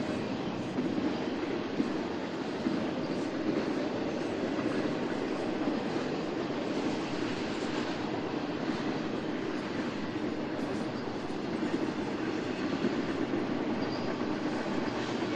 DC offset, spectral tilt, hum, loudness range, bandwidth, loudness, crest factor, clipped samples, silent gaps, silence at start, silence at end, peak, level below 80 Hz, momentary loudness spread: under 0.1%; -6 dB/octave; none; 2 LU; 9.6 kHz; -33 LUFS; 16 dB; under 0.1%; none; 0 s; 0 s; -16 dBFS; -62 dBFS; 3 LU